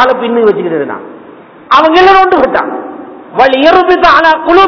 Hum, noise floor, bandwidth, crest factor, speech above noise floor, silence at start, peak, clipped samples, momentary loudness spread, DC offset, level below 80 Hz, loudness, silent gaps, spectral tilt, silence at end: none; -33 dBFS; 5.4 kHz; 8 dB; 26 dB; 0 s; 0 dBFS; 8%; 16 LU; under 0.1%; -38 dBFS; -7 LUFS; none; -5 dB/octave; 0 s